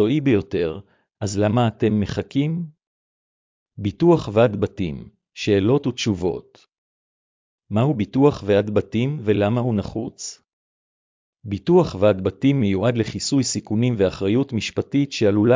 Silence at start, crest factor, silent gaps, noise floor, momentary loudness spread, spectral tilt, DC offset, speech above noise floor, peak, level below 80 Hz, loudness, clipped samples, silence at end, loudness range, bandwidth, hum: 0 s; 18 dB; 2.87-3.66 s, 6.78-7.58 s, 10.53-11.33 s; under -90 dBFS; 12 LU; -6.5 dB/octave; under 0.1%; over 70 dB; -4 dBFS; -46 dBFS; -21 LUFS; under 0.1%; 0 s; 4 LU; 7.6 kHz; none